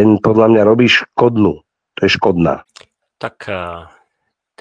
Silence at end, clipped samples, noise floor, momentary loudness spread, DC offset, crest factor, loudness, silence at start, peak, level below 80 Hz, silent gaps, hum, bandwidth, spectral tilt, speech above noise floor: 0.75 s; under 0.1%; -72 dBFS; 18 LU; under 0.1%; 14 dB; -13 LUFS; 0 s; 0 dBFS; -46 dBFS; none; none; 8.4 kHz; -6.5 dB/octave; 59 dB